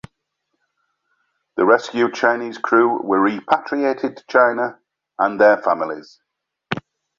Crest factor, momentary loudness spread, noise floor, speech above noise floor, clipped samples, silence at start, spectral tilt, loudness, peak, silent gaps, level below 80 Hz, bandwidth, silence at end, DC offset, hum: 18 dB; 14 LU; -75 dBFS; 57 dB; under 0.1%; 1.55 s; -5.5 dB/octave; -18 LUFS; -2 dBFS; none; -64 dBFS; 7.4 kHz; 0.4 s; under 0.1%; none